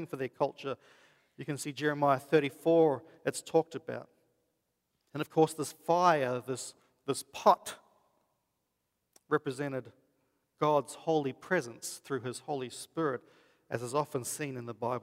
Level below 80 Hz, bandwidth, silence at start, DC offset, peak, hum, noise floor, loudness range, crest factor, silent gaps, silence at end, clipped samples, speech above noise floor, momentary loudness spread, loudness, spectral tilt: -80 dBFS; 16 kHz; 0 s; under 0.1%; -10 dBFS; none; -82 dBFS; 5 LU; 22 dB; none; 0 s; under 0.1%; 50 dB; 14 LU; -32 LUFS; -5 dB/octave